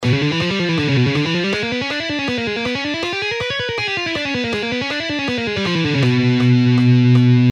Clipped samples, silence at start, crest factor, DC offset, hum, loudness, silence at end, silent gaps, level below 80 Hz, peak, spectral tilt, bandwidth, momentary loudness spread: under 0.1%; 0 s; 12 dB; under 0.1%; none; -17 LUFS; 0 s; none; -50 dBFS; -4 dBFS; -6.5 dB/octave; 9 kHz; 8 LU